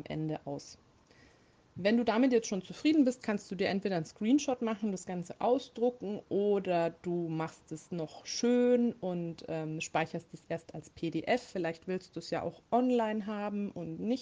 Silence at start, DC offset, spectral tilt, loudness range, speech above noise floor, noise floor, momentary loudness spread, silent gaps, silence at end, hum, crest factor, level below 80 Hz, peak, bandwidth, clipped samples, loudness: 0.1 s; under 0.1%; -5.5 dB/octave; 4 LU; 31 dB; -64 dBFS; 13 LU; none; 0 s; none; 16 dB; -72 dBFS; -16 dBFS; 9.6 kHz; under 0.1%; -33 LUFS